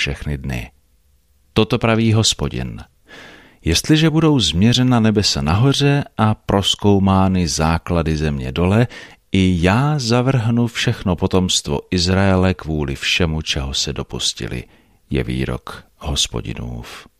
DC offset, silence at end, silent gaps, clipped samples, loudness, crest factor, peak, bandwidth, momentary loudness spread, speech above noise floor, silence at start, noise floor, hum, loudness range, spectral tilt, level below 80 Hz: under 0.1%; 0.15 s; none; under 0.1%; -17 LUFS; 16 dB; -2 dBFS; 14.5 kHz; 13 LU; 41 dB; 0 s; -58 dBFS; none; 6 LU; -5 dB/octave; -34 dBFS